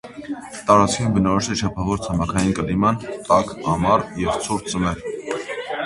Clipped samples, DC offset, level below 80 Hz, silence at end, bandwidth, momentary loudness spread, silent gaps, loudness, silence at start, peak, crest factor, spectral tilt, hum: under 0.1%; under 0.1%; -40 dBFS; 0 s; 11.5 kHz; 11 LU; none; -21 LUFS; 0.05 s; 0 dBFS; 20 dB; -5.5 dB/octave; none